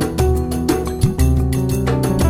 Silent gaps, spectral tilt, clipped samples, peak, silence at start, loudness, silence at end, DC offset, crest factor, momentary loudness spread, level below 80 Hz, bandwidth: none; -6.5 dB/octave; under 0.1%; -2 dBFS; 0 s; -18 LUFS; 0 s; under 0.1%; 14 dB; 3 LU; -22 dBFS; 16 kHz